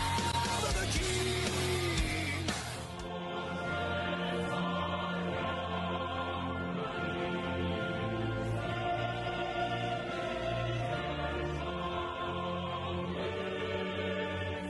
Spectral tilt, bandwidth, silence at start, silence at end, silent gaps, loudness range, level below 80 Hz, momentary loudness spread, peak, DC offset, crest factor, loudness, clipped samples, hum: -4.5 dB/octave; 12 kHz; 0 s; 0 s; none; 2 LU; -48 dBFS; 5 LU; -20 dBFS; under 0.1%; 14 dB; -35 LUFS; under 0.1%; none